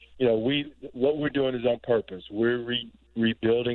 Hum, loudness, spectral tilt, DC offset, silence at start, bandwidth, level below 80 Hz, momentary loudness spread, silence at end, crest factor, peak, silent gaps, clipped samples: none; -27 LUFS; -9 dB/octave; under 0.1%; 0.15 s; 4.3 kHz; -58 dBFS; 7 LU; 0 s; 16 dB; -12 dBFS; none; under 0.1%